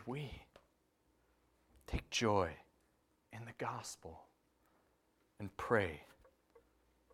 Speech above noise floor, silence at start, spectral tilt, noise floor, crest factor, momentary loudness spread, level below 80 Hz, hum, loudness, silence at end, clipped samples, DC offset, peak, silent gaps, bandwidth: 37 dB; 0 s; -4.5 dB/octave; -77 dBFS; 26 dB; 21 LU; -58 dBFS; none; -40 LUFS; 0.55 s; under 0.1%; under 0.1%; -18 dBFS; none; 16 kHz